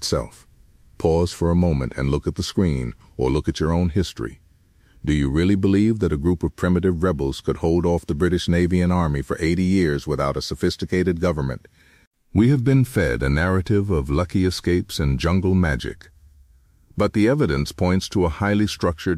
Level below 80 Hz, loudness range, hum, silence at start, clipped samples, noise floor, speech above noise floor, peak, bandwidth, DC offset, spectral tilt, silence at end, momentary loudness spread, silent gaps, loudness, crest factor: -34 dBFS; 3 LU; none; 0 s; under 0.1%; -55 dBFS; 35 dB; -4 dBFS; 15 kHz; under 0.1%; -6.5 dB/octave; 0 s; 6 LU; 12.07-12.11 s; -21 LUFS; 16 dB